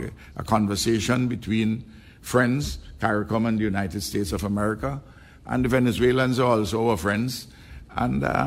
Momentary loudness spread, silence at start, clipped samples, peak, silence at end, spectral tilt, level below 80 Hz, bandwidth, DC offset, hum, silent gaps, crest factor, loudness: 12 LU; 0 s; under 0.1%; -6 dBFS; 0 s; -5.5 dB/octave; -42 dBFS; 16 kHz; under 0.1%; none; none; 18 dB; -24 LUFS